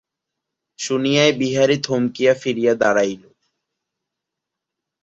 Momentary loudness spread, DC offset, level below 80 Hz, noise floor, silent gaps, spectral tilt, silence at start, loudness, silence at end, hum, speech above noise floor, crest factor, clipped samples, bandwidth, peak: 8 LU; under 0.1%; -64 dBFS; -83 dBFS; none; -4.5 dB/octave; 0.8 s; -18 LUFS; 1.85 s; none; 65 dB; 18 dB; under 0.1%; 8 kHz; -2 dBFS